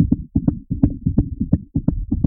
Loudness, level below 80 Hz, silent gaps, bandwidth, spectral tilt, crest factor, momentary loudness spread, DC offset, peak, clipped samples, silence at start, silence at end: -21 LUFS; -28 dBFS; none; 1.9 kHz; -17.5 dB/octave; 18 dB; 4 LU; under 0.1%; -2 dBFS; under 0.1%; 0 s; 0 s